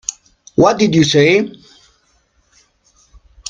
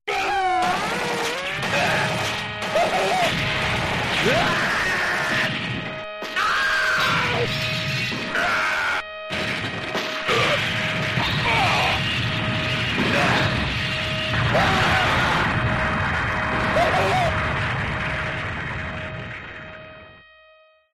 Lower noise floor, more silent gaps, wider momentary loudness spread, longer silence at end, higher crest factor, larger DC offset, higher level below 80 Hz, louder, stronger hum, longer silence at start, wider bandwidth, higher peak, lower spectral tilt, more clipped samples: first, -58 dBFS vs -54 dBFS; neither; first, 14 LU vs 8 LU; first, 2 s vs 0.75 s; about the same, 16 dB vs 16 dB; neither; second, -48 dBFS vs -40 dBFS; first, -13 LUFS vs -21 LUFS; neither; about the same, 0.1 s vs 0.05 s; second, 9.6 kHz vs 13.5 kHz; first, 0 dBFS vs -8 dBFS; about the same, -5 dB/octave vs -4 dB/octave; neither